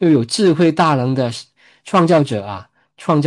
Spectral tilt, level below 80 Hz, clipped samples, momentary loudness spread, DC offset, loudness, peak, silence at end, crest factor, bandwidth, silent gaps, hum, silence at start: -6.5 dB/octave; -62 dBFS; under 0.1%; 15 LU; under 0.1%; -15 LUFS; -2 dBFS; 0 s; 14 dB; 11.5 kHz; none; none; 0 s